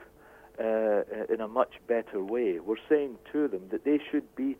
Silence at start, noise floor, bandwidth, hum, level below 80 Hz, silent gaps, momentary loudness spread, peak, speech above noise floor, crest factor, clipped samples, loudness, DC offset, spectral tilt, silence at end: 0 s; -54 dBFS; 15.5 kHz; none; -66 dBFS; none; 6 LU; -10 dBFS; 25 dB; 20 dB; under 0.1%; -30 LUFS; under 0.1%; -7.5 dB/octave; 0.05 s